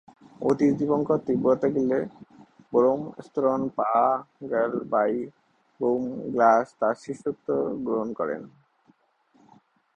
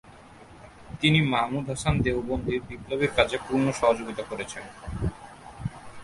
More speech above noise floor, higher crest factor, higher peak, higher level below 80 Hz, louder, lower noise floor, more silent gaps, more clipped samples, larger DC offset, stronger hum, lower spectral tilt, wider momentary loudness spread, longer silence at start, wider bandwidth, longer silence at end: first, 40 dB vs 23 dB; about the same, 20 dB vs 22 dB; about the same, -6 dBFS vs -4 dBFS; second, -66 dBFS vs -44 dBFS; about the same, -25 LUFS vs -27 LUFS; first, -64 dBFS vs -49 dBFS; neither; neither; neither; neither; first, -8 dB/octave vs -5.5 dB/octave; second, 9 LU vs 15 LU; first, 0.4 s vs 0.05 s; second, 9.2 kHz vs 11.5 kHz; first, 1.45 s vs 0 s